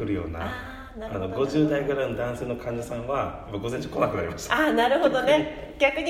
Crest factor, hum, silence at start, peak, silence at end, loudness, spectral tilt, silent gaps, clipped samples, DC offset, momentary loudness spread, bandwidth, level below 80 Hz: 18 dB; none; 0 s; -8 dBFS; 0 s; -26 LUFS; -5.5 dB/octave; none; under 0.1%; under 0.1%; 12 LU; 16 kHz; -46 dBFS